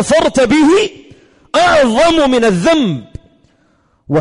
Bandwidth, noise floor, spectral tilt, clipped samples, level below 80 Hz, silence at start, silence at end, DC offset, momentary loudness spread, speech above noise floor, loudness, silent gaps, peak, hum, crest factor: 11 kHz; -55 dBFS; -5 dB/octave; under 0.1%; -40 dBFS; 0 s; 0 s; under 0.1%; 8 LU; 45 dB; -11 LUFS; none; -4 dBFS; none; 10 dB